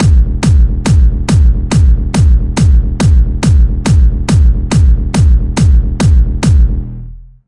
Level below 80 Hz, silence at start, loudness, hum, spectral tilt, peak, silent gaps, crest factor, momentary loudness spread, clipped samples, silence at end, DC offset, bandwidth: -10 dBFS; 0 s; -11 LUFS; none; -6.5 dB/octave; 0 dBFS; none; 8 dB; 1 LU; under 0.1%; 0.25 s; under 0.1%; 11.5 kHz